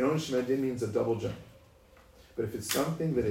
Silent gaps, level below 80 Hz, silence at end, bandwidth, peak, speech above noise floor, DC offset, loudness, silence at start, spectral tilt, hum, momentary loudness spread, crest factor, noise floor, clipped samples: none; -58 dBFS; 0 s; 16 kHz; -12 dBFS; 27 dB; under 0.1%; -31 LUFS; 0 s; -5.5 dB/octave; none; 9 LU; 20 dB; -58 dBFS; under 0.1%